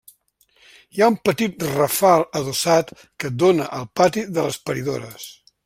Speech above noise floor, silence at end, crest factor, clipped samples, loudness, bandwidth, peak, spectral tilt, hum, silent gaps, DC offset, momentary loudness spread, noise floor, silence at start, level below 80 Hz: 41 dB; 0.35 s; 18 dB; under 0.1%; -20 LUFS; 16.5 kHz; -2 dBFS; -4.5 dB/octave; none; none; under 0.1%; 15 LU; -61 dBFS; 0.95 s; -58 dBFS